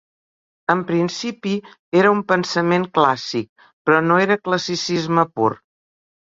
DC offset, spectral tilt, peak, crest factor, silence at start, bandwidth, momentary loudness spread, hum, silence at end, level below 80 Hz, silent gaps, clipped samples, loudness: under 0.1%; -5.5 dB/octave; -2 dBFS; 18 dB; 0.7 s; 7.8 kHz; 10 LU; none; 0.75 s; -62 dBFS; 1.79-1.92 s, 3.49-3.56 s, 3.73-3.85 s; under 0.1%; -19 LUFS